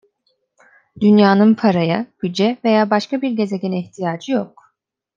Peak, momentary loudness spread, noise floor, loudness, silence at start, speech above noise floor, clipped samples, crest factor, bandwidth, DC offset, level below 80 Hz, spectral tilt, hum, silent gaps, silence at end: -2 dBFS; 12 LU; -68 dBFS; -17 LUFS; 1 s; 52 dB; under 0.1%; 16 dB; 7.4 kHz; under 0.1%; -66 dBFS; -7 dB/octave; none; none; 0.7 s